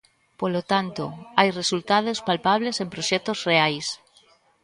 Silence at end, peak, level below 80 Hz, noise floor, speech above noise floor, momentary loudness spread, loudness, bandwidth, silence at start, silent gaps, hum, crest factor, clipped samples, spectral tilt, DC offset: 0.65 s; 0 dBFS; -64 dBFS; -59 dBFS; 35 dB; 10 LU; -23 LUFS; 11.5 kHz; 0.4 s; none; none; 24 dB; under 0.1%; -3.5 dB/octave; under 0.1%